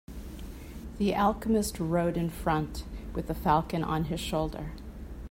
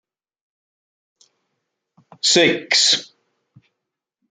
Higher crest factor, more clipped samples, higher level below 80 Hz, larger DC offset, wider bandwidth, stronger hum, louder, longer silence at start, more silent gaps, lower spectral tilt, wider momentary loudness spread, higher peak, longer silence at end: about the same, 20 dB vs 22 dB; neither; first, -42 dBFS vs -72 dBFS; neither; first, 16 kHz vs 9.6 kHz; neither; second, -30 LUFS vs -15 LUFS; second, 0.1 s vs 2.25 s; neither; first, -6 dB/octave vs -1.5 dB/octave; first, 17 LU vs 6 LU; second, -10 dBFS vs -2 dBFS; second, 0 s vs 1.25 s